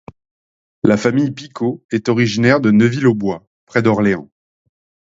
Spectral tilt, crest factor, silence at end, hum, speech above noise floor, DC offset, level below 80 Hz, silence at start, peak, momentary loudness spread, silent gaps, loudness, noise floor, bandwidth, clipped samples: -7 dB/octave; 16 dB; 0.8 s; none; over 75 dB; under 0.1%; -52 dBFS; 0.85 s; 0 dBFS; 10 LU; 1.85-1.89 s, 3.47-3.67 s; -16 LUFS; under -90 dBFS; 7.8 kHz; under 0.1%